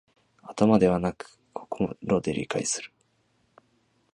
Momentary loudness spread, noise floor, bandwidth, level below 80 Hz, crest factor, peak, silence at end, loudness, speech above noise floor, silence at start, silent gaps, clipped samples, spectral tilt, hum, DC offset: 21 LU; -69 dBFS; 11 kHz; -56 dBFS; 22 dB; -6 dBFS; 1.25 s; -26 LUFS; 44 dB; 0.45 s; none; under 0.1%; -5.5 dB/octave; none; under 0.1%